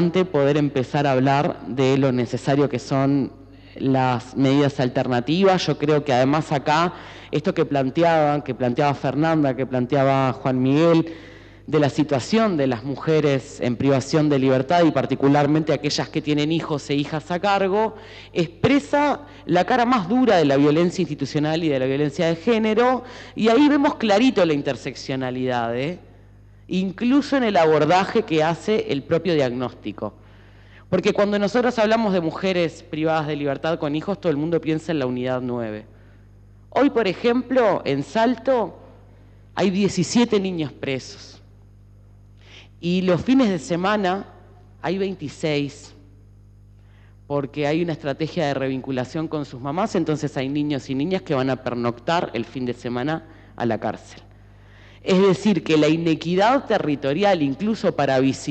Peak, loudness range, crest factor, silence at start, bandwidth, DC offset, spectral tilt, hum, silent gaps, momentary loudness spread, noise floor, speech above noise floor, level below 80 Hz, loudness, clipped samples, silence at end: -6 dBFS; 6 LU; 16 dB; 0 s; 8.8 kHz; under 0.1%; -6.5 dB/octave; 50 Hz at -45 dBFS; none; 9 LU; -48 dBFS; 27 dB; -52 dBFS; -21 LUFS; under 0.1%; 0 s